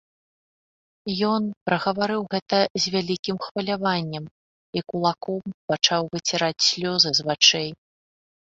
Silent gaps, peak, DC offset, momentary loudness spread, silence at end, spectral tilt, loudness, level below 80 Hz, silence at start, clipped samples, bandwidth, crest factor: 1.57-1.66 s, 2.42-2.46 s, 2.70-2.75 s, 3.19-3.23 s, 3.51-3.55 s, 4.31-4.73 s, 5.54-5.68 s; -2 dBFS; under 0.1%; 14 LU; 0.75 s; -3 dB/octave; -22 LUFS; -64 dBFS; 1.05 s; under 0.1%; 8 kHz; 22 dB